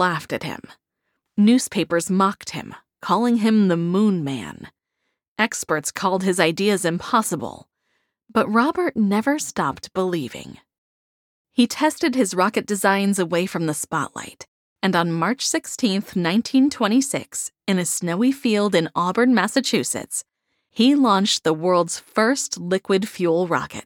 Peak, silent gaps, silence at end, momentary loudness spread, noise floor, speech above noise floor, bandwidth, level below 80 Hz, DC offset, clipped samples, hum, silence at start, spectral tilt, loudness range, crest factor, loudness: -2 dBFS; 5.28-5.36 s, 10.78-11.45 s, 14.48-14.76 s; 0.05 s; 11 LU; -77 dBFS; 56 dB; 17.5 kHz; -64 dBFS; under 0.1%; under 0.1%; none; 0 s; -4.5 dB/octave; 3 LU; 20 dB; -21 LUFS